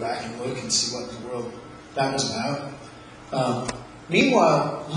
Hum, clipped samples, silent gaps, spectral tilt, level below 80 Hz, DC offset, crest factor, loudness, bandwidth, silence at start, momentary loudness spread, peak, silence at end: none; under 0.1%; none; -3.5 dB/octave; -56 dBFS; under 0.1%; 22 dB; -24 LUFS; 11 kHz; 0 s; 20 LU; -4 dBFS; 0 s